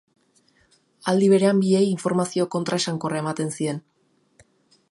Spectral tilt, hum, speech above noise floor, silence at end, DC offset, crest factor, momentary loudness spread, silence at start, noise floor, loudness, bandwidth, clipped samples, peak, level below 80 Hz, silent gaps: -5.5 dB/octave; none; 41 dB; 1.15 s; under 0.1%; 16 dB; 11 LU; 1.05 s; -62 dBFS; -22 LUFS; 11.5 kHz; under 0.1%; -6 dBFS; -70 dBFS; none